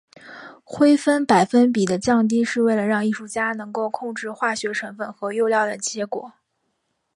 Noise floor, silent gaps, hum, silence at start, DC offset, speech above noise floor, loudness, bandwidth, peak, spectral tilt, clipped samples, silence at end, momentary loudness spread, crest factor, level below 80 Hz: -73 dBFS; none; none; 0.25 s; under 0.1%; 53 dB; -21 LUFS; 11.5 kHz; -2 dBFS; -4.5 dB/octave; under 0.1%; 0.85 s; 13 LU; 18 dB; -64 dBFS